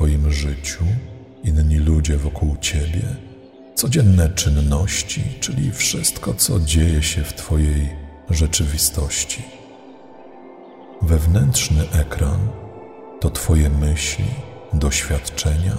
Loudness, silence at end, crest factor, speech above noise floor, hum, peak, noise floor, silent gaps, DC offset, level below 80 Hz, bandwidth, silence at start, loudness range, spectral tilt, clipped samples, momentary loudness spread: -19 LUFS; 0 s; 18 dB; 24 dB; none; -2 dBFS; -41 dBFS; none; under 0.1%; -24 dBFS; 16 kHz; 0 s; 3 LU; -4.5 dB/octave; under 0.1%; 10 LU